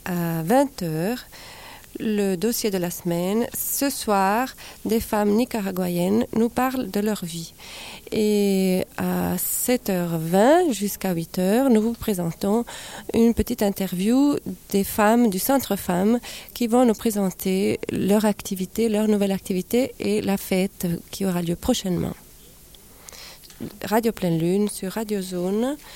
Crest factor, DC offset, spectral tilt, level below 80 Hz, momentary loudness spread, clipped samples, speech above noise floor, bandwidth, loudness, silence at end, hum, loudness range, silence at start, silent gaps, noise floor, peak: 16 dB; under 0.1%; -5.5 dB/octave; -48 dBFS; 12 LU; under 0.1%; 25 dB; 17 kHz; -23 LUFS; 0 s; none; 5 LU; 0.05 s; none; -47 dBFS; -6 dBFS